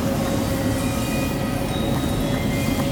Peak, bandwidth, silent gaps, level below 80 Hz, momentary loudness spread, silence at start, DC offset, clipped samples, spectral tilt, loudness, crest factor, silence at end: -10 dBFS; over 20 kHz; none; -34 dBFS; 1 LU; 0 s; under 0.1%; under 0.1%; -5.5 dB/octave; -23 LUFS; 12 dB; 0 s